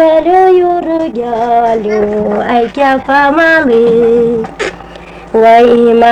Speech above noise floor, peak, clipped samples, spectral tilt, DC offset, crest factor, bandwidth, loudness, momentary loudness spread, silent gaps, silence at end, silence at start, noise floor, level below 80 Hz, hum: 21 dB; 0 dBFS; under 0.1%; -6 dB/octave; under 0.1%; 8 dB; 9.4 kHz; -9 LUFS; 9 LU; none; 0 s; 0 s; -29 dBFS; -40 dBFS; none